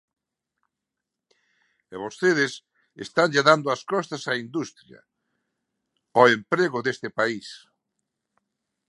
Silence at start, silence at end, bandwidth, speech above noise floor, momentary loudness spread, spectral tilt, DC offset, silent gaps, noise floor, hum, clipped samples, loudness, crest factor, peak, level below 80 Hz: 1.9 s; 1.3 s; 11.5 kHz; 62 dB; 18 LU; -4.5 dB/octave; under 0.1%; none; -85 dBFS; none; under 0.1%; -23 LUFS; 26 dB; 0 dBFS; -74 dBFS